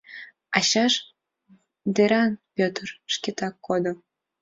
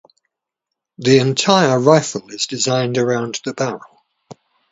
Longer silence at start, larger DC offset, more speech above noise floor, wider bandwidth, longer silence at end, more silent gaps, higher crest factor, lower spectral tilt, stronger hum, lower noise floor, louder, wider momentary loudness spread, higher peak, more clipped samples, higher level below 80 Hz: second, 0.1 s vs 1 s; neither; second, 36 dB vs 65 dB; about the same, 7.8 kHz vs 8 kHz; about the same, 0.45 s vs 0.4 s; neither; about the same, 20 dB vs 18 dB; about the same, -3.5 dB/octave vs -4.5 dB/octave; neither; second, -60 dBFS vs -81 dBFS; second, -24 LUFS vs -16 LUFS; first, 14 LU vs 11 LU; second, -6 dBFS vs 0 dBFS; neither; second, -68 dBFS vs -60 dBFS